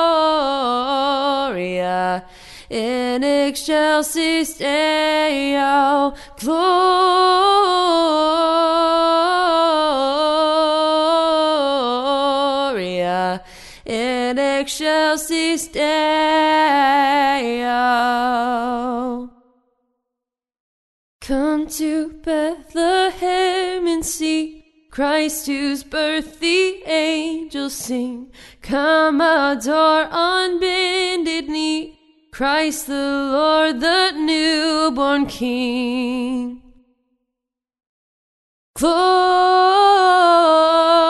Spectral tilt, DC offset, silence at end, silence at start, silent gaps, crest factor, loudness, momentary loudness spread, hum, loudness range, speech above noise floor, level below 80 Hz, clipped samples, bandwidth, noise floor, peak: -3 dB/octave; under 0.1%; 0 s; 0 s; 20.60-21.20 s, 37.89-38.74 s; 16 dB; -17 LUFS; 9 LU; none; 7 LU; 68 dB; -48 dBFS; under 0.1%; 12 kHz; -85 dBFS; -2 dBFS